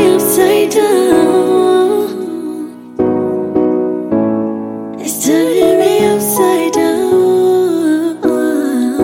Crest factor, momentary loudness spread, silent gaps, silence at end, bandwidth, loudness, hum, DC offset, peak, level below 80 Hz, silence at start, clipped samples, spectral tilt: 12 dB; 10 LU; none; 0 s; 17 kHz; -12 LUFS; none; under 0.1%; 0 dBFS; -52 dBFS; 0 s; under 0.1%; -4.5 dB/octave